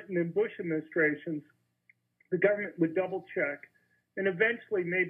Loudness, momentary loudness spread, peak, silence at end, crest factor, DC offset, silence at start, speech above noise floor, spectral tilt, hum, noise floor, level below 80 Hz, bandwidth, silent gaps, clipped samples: -31 LUFS; 10 LU; -10 dBFS; 0 s; 20 dB; under 0.1%; 0 s; 39 dB; -9.5 dB/octave; none; -69 dBFS; -86 dBFS; 3.7 kHz; none; under 0.1%